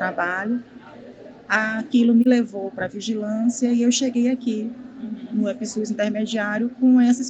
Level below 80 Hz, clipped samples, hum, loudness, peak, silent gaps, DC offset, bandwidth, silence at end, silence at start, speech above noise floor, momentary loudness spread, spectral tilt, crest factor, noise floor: -66 dBFS; under 0.1%; none; -21 LUFS; -4 dBFS; none; under 0.1%; 8.4 kHz; 0 s; 0 s; 21 dB; 12 LU; -4.5 dB/octave; 16 dB; -42 dBFS